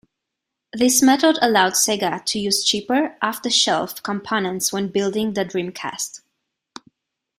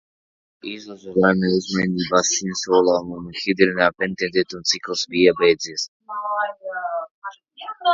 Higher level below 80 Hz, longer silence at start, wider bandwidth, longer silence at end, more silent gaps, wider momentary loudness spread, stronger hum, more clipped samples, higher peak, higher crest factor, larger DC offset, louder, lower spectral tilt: second, -62 dBFS vs -56 dBFS; about the same, 0.75 s vs 0.65 s; first, 16 kHz vs 7.8 kHz; first, 1.2 s vs 0 s; second, none vs 5.88-6.00 s, 7.11-7.22 s; second, 12 LU vs 16 LU; neither; neither; second, -4 dBFS vs 0 dBFS; about the same, 18 dB vs 20 dB; neither; about the same, -19 LUFS vs -20 LUFS; about the same, -2.5 dB/octave vs -3.5 dB/octave